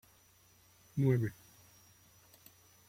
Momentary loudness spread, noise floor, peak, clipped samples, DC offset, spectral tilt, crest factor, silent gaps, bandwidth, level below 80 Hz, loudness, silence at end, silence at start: 27 LU; -66 dBFS; -18 dBFS; under 0.1%; under 0.1%; -8 dB/octave; 20 dB; none; 16.5 kHz; -72 dBFS; -34 LUFS; 1.55 s; 0.95 s